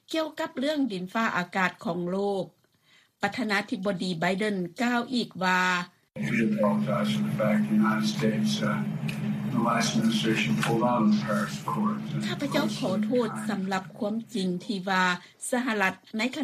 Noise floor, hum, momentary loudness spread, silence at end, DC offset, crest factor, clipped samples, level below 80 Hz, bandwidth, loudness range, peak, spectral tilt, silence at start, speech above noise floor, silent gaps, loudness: -63 dBFS; none; 7 LU; 0 s; under 0.1%; 16 dB; under 0.1%; -66 dBFS; 14.5 kHz; 3 LU; -10 dBFS; -5 dB/octave; 0.1 s; 36 dB; none; -27 LUFS